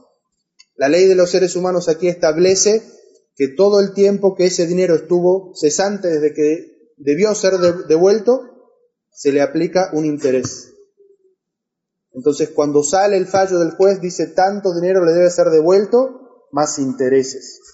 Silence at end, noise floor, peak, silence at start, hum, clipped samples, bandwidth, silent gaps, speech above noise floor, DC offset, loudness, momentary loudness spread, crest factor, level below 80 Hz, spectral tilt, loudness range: 0.2 s; -79 dBFS; -2 dBFS; 0.8 s; none; under 0.1%; 8 kHz; none; 65 dB; under 0.1%; -15 LUFS; 8 LU; 12 dB; -62 dBFS; -4.5 dB/octave; 6 LU